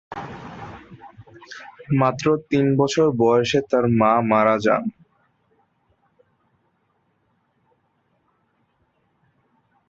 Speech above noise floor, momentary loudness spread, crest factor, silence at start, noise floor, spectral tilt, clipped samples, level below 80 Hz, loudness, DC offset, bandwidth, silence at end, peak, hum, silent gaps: 49 dB; 22 LU; 20 dB; 0.1 s; -67 dBFS; -6.5 dB/octave; under 0.1%; -58 dBFS; -19 LUFS; under 0.1%; 7.8 kHz; 4.95 s; -4 dBFS; none; none